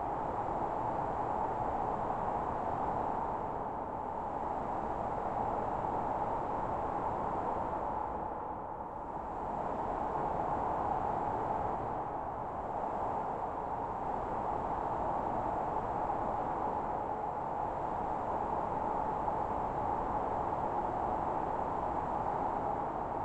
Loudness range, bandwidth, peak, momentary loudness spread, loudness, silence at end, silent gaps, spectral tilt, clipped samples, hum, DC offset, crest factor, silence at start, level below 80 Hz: 2 LU; 8.6 kHz; -22 dBFS; 4 LU; -36 LUFS; 0 s; none; -8 dB/octave; under 0.1%; none; under 0.1%; 14 dB; 0 s; -52 dBFS